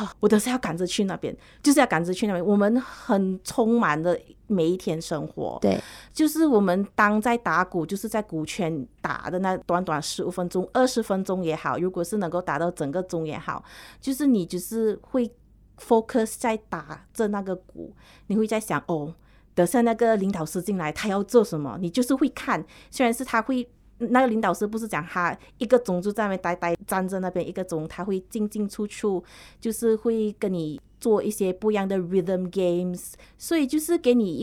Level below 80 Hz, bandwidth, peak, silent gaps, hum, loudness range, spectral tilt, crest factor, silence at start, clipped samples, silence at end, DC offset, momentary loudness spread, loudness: -56 dBFS; 17 kHz; -4 dBFS; none; none; 4 LU; -5.5 dB/octave; 20 dB; 0 s; under 0.1%; 0 s; under 0.1%; 10 LU; -25 LUFS